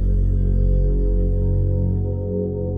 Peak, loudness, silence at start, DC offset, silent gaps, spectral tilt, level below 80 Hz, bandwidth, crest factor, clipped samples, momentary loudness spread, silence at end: -10 dBFS; -21 LUFS; 0 s; under 0.1%; none; -13 dB/octave; -20 dBFS; 1.5 kHz; 8 dB; under 0.1%; 4 LU; 0 s